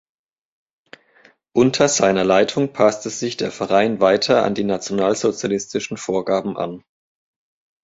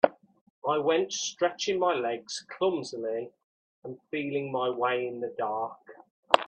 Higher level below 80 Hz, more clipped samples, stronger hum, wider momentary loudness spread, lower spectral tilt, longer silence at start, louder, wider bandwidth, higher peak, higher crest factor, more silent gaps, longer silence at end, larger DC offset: first, -58 dBFS vs -78 dBFS; neither; neither; about the same, 10 LU vs 11 LU; about the same, -4 dB/octave vs -3.5 dB/octave; first, 1.55 s vs 0.05 s; first, -19 LUFS vs -30 LUFS; second, 8 kHz vs 9.2 kHz; about the same, -2 dBFS vs 0 dBFS; second, 18 dB vs 30 dB; second, none vs 0.41-0.62 s, 3.44-3.82 s, 6.11-6.23 s; first, 1.05 s vs 0 s; neither